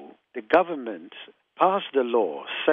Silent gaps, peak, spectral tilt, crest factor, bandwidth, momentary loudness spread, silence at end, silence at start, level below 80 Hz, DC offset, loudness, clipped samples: none; -4 dBFS; -7 dB/octave; 20 dB; 5.4 kHz; 18 LU; 0 s; 0 s; -70 dBFS; under 0.1%; -24 LUFS; under 0.1%